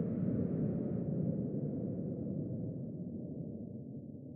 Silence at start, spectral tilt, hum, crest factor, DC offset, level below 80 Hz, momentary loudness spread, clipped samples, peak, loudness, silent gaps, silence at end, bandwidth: 0 s; -14.5 dB/octave; none; 14 dB; under 0.1%; -62 dBFS; 10 LU; under 0.1%; -24 dBFS; -39 LUFS; none; 0 s; 2.6 kHz